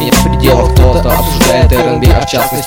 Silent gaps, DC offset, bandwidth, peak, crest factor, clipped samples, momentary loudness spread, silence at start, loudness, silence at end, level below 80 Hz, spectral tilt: none; under 0.1%; 18.5 kHz; 0 dBFS; 8 dB; 1%; 3 LU; 0 s; -9 LUFS; 0 s; -14 dBFS; -5 dB/octave